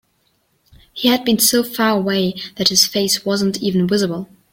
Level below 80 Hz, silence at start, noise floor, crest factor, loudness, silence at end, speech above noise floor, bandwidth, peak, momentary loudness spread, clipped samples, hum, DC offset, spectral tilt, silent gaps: -56 dBFS; 0.95 s; -63 dBFS; 18 dB; -16 LUFS; 0.25 s; 47 dB; 16.5 kHz; 0 dBFS; 8 LU; under 0.1%; none; under 0.1%; -3.5 dB/octave; none